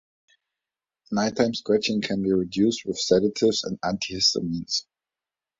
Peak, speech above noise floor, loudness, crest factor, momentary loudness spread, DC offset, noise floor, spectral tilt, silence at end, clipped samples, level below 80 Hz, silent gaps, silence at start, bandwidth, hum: -6 dBFS; over 66 dB; -24 LUFS; 20 dB; 7 LU; under 0.1%; under -90 dBFS; -4 dB/octave; 0.75 s; under 0.1%; -58 dBFS; none; 1.1 s; 7.8 kHz; none